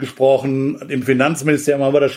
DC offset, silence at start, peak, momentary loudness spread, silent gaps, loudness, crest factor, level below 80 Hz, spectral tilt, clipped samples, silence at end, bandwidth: under 0.1%; 0 s; -2 dBFS; 6 LU; none; -17 LUFS; 14 dB; -60 dBFS; -6 dB/octave; under 0.1%; 0 s; 16.5 kHz